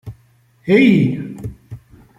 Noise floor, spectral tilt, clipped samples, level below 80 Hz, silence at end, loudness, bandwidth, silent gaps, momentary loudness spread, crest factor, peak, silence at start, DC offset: -54 dBFS; -8 dB/octave; under 0.1%; -48 dBFS; 0.4 s; -14 LUFS; 10.5 kHz; none; 20 LU; 16 dB; -2 dBFS; 0.05 s; under 0.1%